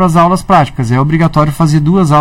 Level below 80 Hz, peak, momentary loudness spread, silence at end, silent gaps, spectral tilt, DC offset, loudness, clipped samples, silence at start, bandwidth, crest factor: -30 dBFS; 0 dBFS; 3 LU; 0 s; none; -7.5 dB/octave; under 0.1%; -10 LUFS; 0.9%; 0 s; 14.5 kHz; 8 dB